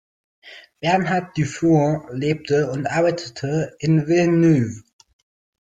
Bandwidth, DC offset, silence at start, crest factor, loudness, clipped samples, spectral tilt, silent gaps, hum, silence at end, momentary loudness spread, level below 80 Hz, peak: 9 kHz; under 0.1%; 0.45 s; 14 dB; -20 LUFS; under 0.1%; -7 dB/octave; none; none; 0.8 s; 9 LU; -56 dBFS; -6 dBFS